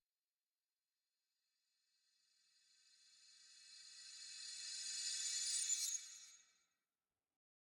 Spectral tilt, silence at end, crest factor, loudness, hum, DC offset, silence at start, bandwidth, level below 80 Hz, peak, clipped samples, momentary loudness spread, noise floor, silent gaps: 5.5 dB/octave; 1.2 s; 22 dB; -42 LUFS; none; under 0.1%; 3 s; 18 kHz; under -90 dBFS; -28 dBFS; under 0.1%; 23 LU; under -90 dBFS; none